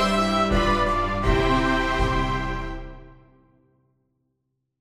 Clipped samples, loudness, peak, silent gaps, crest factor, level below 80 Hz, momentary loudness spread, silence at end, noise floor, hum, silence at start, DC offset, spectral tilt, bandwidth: under 0.1%; -22 LUFS; -8 dBFS; none; 16 dB; -32 dBFS; 12 LU; 1.7 s; -76 dBFS; none; 0 s; under 0.1%; -5.5 dB/octave; 13 kHz